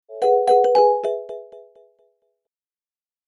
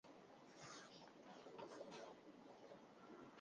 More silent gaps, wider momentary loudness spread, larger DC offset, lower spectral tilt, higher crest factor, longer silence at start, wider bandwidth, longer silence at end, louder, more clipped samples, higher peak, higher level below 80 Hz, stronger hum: neither; first, 19 LU vs 7 LU; neither; about the same, -3.5 dB/octave vs -4 dB/octave; about the same, 16 dB vs 18 dB; about the same, 0.1 s vs 0.05 s; about the same, 10.5 kHz vs 9.6 kHz; first, 1.7 s vs 0 s; first, -17 LUFS vs -61 LUFS; neither; first, -4 dBFS vs -44 dBFS; first, -82 dBFS vs under -90 dBFS; neither